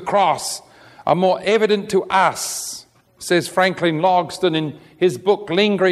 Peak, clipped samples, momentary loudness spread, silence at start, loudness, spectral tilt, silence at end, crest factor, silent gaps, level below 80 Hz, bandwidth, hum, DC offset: -2 dBFS; under 0.1%; 11 LU; 0 s; -18 LUFS; -4 dB/octave; 0 s; 16 dB; none; -60 dBFS; 14.5 kHz; none; under 0.1%